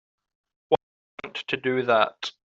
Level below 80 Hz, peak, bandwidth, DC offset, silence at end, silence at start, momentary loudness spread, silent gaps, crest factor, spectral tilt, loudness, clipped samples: -70 dBFS; -6 dBFS; 8 kHz; under 0.1%; 0.2 s; 0.7 s; 14 LU; 0.83-1.18 s; 22 dB; -2 dB/octave; -25 LUFS; under 0.1%